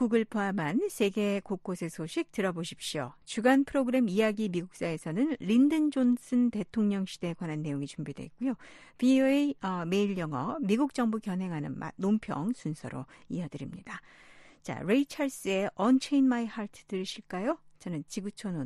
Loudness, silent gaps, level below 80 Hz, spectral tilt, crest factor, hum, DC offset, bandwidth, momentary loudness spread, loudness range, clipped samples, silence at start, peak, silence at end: -30 LUFS; none; -66 dBFS; -6 dB/octave; 18 dB; none; under 0.1%; 12.5 kHz; 13 LU; 6 LU; under 0.1%; 0 s; -12 dBFS; 0 s